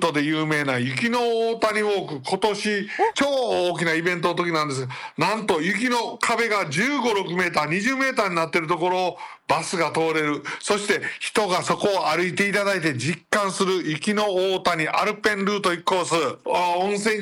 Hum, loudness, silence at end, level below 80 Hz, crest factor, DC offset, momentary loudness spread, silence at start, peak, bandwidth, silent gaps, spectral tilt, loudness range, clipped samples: none; -22 LUFS; 0 s; -66 dBFS; 14 dB; under 0.1%; 3 LU; 0 s; -8 dBFS; 17 kHz; none; -4 dB/octave; 1 LU; under 0.1%